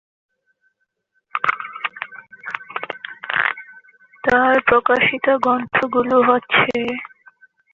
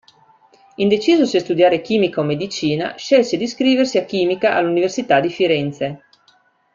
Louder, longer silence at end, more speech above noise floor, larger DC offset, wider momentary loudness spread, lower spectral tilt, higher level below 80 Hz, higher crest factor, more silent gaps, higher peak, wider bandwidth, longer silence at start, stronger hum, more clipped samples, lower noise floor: about the same, -18 LUFS vs -17 LUFS; second, 0.65 s vs 0.8 s; first, 54 dB vs 40 dB; neither; first, 16 LU vs 6 LU; about the same, -5.5 dB/octave vs -5 dB/octave; about the same, -56 dBFS vs -60 dBFS; about the same, 18 dB vs 16 dB; neither; about the same, -2 dBFS vs -2 dBFS; about the same, 7.2 kHz vs 7.6 kHz; first, 1.35 s vs 0.8 s; neither; neither; first, -70 dBFS vs -57 dBFS